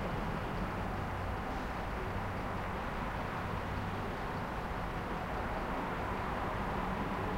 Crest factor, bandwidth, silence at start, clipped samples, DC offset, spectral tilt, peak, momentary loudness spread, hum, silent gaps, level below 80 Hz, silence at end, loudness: 14 dB; 16.5 kHz; 0 s; under 0.1%; under 0.1%; -6.5 dB/octave; -24 dBFS; 2 LU; none; none; -44 dBFS; 0 s; -38 LUFS